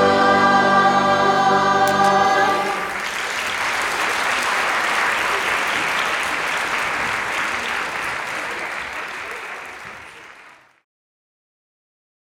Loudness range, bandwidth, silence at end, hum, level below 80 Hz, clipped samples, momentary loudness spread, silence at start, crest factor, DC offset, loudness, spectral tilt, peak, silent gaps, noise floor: 13 LU; 19.5 kHz; 1.8 s; none; -54 dBFS; under 0.1%; 14 LU; 0 s; 16 dB; under 0.1%; -18 LUFS; -3 dB/octave; -4 dBFS; none; -47 dBFS